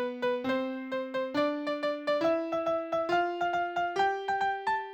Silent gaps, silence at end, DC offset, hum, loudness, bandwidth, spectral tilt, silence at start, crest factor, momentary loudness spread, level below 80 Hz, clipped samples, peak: none; 0 s; under 0.1%; none; -30 LUFS; 19.5 kHz; -5 dB/octave; 0 s; 14 dB; 4 LU; -70 dBFS; under 0.1%; -16 dBFS